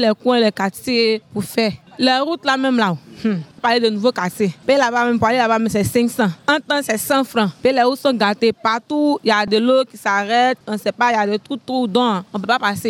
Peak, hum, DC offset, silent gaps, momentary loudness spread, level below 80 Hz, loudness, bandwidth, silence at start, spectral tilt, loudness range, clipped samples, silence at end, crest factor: -2 dBFS; none; under 0.1%; none; 6 LU; -58 dBFS; -17 LUFS; 18 kHz; 0 s; -4.5 dB/octave; 2 LU; under 0.1%; 0 s; 14 dB